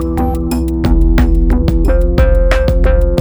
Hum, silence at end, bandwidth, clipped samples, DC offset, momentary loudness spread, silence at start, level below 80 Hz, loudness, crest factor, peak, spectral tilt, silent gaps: none; 0 s; over 20 kHz; under 0.1%; 0.9%; 4 LU; 0 s; -12 dBFS; -13 LUFS; 10 dB; 0 dBFS; -8 dB/octave; none